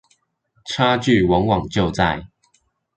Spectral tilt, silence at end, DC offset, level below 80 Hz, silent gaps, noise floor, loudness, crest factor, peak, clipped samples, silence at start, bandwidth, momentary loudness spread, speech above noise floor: -6 dB/octave; 0.7 s; under 0.1%; -40 dBFS; none; -65 dBFS; -19 LUFS; 18 dB; -2 dBFS; under 0.1%; 0.65 s; 9.2 kHz; 13 LU; 47 dB